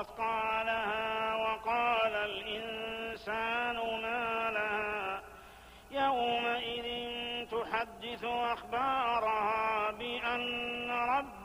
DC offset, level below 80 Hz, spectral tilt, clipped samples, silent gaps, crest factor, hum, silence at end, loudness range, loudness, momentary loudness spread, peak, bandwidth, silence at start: under 0.1%; -62 dBFS; -4 dB/octave; under 0.1%; none; 14 dB; none; 0 s; 2 LU; -33 LUFS; 7 LU; -20 dBFS; 15.5 kHz; 0 s